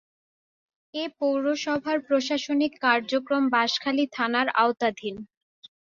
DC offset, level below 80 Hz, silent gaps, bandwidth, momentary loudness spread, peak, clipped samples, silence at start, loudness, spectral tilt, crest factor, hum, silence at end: under 0.1%; -70 dBFS; none; 7.4 kHz; 11 LU; -6 dBFS; under 0.1%; 0.95 s; -25 LUFS; -3.5 dB/octave; 20 dB; none; 0.6 s